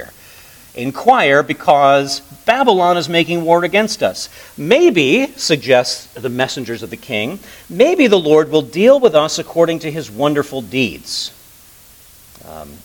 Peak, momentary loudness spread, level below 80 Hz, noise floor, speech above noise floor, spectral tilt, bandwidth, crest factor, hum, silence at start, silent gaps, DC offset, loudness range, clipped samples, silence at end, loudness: 0 dBFS; 15 LU; -54 dBFS; -43 dBFS; 29 dB; -4.5 dB/octave; 19 kHz; 14 dB; none; 0 s; none; under 0.1%; 3 LU; under 0.1%; 0.1 s; -14 LUFS